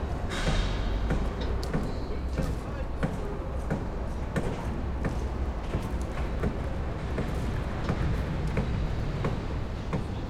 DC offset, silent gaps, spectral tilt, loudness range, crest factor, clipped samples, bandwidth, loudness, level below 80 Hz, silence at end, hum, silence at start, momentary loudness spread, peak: under 0.1%; none; -7 dB/octave; 2 LU; 16 dB; under 0.1%; 12.5 kHz; -32 LUFS; -32 dBFS; 0 s; none; 0 s; 4 LU; -14 dBFS